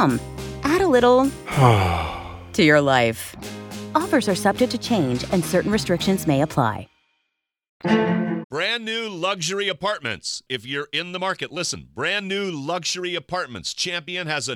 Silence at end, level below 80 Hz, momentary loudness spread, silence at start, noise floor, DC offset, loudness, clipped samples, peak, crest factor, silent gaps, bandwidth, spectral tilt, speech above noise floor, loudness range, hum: 0 s; -46 dBFS; 12 LU; 0 s; -77 dBFS; under 0.1%; -22 LUFS; under 0.1%; -2 dBFS; 20 dB; 7.69-7.80 s, 8.44-8.50 s; 20 kHz; -4.5 dB/octave; 56 dB; 7 LU; none